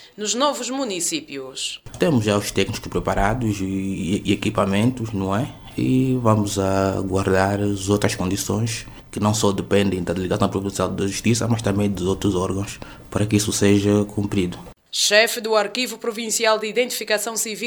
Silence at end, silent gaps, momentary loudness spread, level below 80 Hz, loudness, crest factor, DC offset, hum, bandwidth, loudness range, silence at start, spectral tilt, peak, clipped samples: 0 s; none; 8 LU; -42 dBFS; -21 LUFS; 20 dB; under 0.1%; none; over 20 kHz; 3 LU; 0 s; -4.5 dB/octave; 0 dBFS; under 0.1%